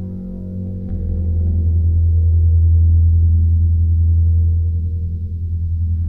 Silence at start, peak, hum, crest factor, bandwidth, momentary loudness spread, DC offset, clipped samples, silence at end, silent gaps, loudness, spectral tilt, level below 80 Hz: 0 s; -6 dBFS; none; 8 dB; 0.7 kHz; 12 LU; 0.7%; under 0.1%; 0 s; none; -16 LUFS; -13.5 dB/octave; -20 dBFS